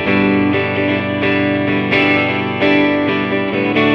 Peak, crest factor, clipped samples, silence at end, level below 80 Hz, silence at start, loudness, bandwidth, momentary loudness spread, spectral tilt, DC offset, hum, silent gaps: -2 dBFS; 14 dB; under 0.1%; 0 s; -48 dBFS; 0 s; -14 LUFS; 6.2 kHz; 4 LU; -7.5 dB/octave; under 0.1%; 50 Hz at -50 dBFS; none